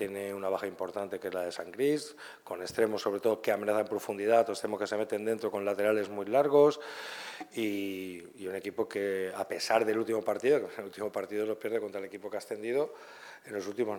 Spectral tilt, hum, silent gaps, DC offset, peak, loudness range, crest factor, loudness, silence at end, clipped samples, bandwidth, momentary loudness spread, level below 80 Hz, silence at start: -4.5 dB/octave; none; none; under 0.1%; -12 dBFS; 5 LU; 20 dB; -32 LUFS; 0 s; under 0.1%; 19 kHz; 13 LU; -80 dBFS; 0 s